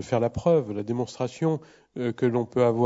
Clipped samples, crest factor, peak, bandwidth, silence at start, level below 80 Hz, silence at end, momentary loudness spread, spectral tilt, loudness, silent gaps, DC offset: under 0.1%; 16 dB; -10 dBFS; 7.8 kHz; 0 s; -56 dBFS; 0 s; 8 LU; -7.5 dB/octave; -26 LUFS; none; under 0.1%